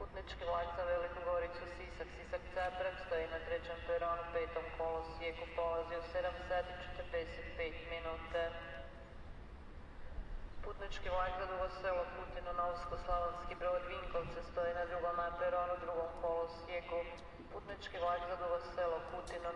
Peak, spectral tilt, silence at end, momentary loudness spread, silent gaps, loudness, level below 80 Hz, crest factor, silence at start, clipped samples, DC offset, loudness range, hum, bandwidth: -26 dBFS; -5.5 dB/octave; 0 s; 12 LU; none; -41 LUFS; -52 dBFS; 16 dB; 0 s; under 0.1%; under 0.1%; 5 LU; none; 10.5 kHz